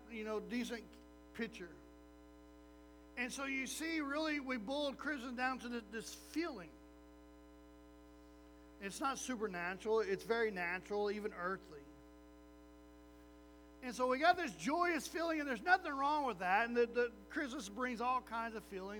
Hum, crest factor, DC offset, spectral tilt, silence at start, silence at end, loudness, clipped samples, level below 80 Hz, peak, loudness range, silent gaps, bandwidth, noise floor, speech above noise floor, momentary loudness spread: 60 Hz at -65 dBFS; 24 dB; under 0.1%; -3.5 dB/octave; 0 s; 0 s; -39 LUFS; under 0.1%; -66 dBFS; -18 dBFS; 10 LU; none; over 20 kHz; -60 dBFS; 21 dB; 16 LU